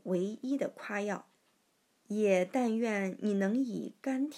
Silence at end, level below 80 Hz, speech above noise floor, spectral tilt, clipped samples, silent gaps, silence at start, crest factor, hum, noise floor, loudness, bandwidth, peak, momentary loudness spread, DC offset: 0 s; under -90 dBFS; 41 dB; -6.5 dB/octave; under 0.1%; none; 0.05 s; 18 dB; none; -74 dBFS; -33 LUFS; 13.5 kHz; -16 dBFS; 9 LU; under 0.1%